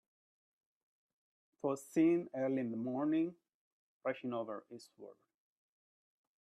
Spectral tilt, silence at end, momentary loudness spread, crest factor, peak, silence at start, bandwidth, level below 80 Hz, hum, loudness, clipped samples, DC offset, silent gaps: -7 dB/octave; 1.3 s; 23 LU; 18 dB; -22 dBFS; 1.65 s; 12.5 kHz; -84 dBFS; none; -37 LUFS; under 0.1%; under 0.1%; 3.55-4.00 s